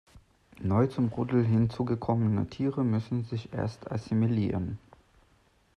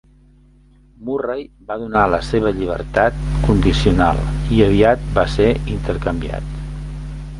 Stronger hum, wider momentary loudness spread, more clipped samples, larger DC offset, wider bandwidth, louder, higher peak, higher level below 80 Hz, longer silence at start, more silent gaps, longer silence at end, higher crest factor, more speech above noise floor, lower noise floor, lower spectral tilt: neither; second, 9 LU vs 15 LU; neither; neither; second, 6.6 kHz vs 11.5 kHz; second, -29 LUFS vs -17 LUFS; second, -12 dBFS vs 0 dBFS; second, -58 dBFS vs -26 dBFS; second, 0.15 s vs 1 s; neither; first, 1 s vs 0 s; about the same, 16 dB vs 18 dB; first, 37 dB vs 32 dB; first, -65 dBFS vs -49 dBFS; first, -9.5 dB/octave vs -7 dB/octave